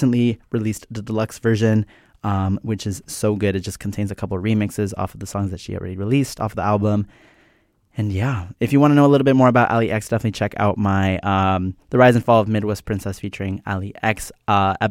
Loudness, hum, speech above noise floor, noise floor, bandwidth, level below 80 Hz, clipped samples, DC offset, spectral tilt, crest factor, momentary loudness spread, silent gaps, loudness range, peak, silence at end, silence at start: -20 LUFS; none; 41 dB; -60 dBFS; 16 kHz; -48 dBFS; under 0.1%; under 0.1%; -7 dB/octave; 18 dB; 13 LU; none; 6 LU; -2 dBFS; 0 s; 0 s